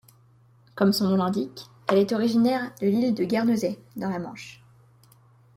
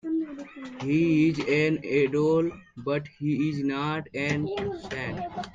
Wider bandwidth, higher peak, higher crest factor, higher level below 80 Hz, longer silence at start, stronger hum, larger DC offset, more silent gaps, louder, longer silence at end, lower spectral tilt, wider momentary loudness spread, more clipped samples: first, 16.5 kHz vs 7.6 kHz; first, -8 dBFS vs -12 dBFS; about the same, 18 dB vs 16 dB; second, -66 dBFS vs -58 dBFS; first, 0.75 s vs 0.05 s; neither; neither; neither; about the same, -25 LUFS vs -27 LUFS; first, 1 s vs 0.05 s; about the same, -6.5 dB/octave vs -7 dB/octave; first, 14 LU vs 11 LU; neither